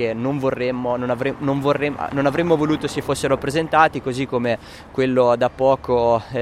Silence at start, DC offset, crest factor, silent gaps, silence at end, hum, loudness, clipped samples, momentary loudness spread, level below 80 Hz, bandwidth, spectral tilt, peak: 0 s; under 0.1%; 18 dB; none; 0 s; none; -20 LUFS; under 0.1%; 6 LU; -46 dBFS; 14.5 kHz; -6 dB/octave; -2 dBFS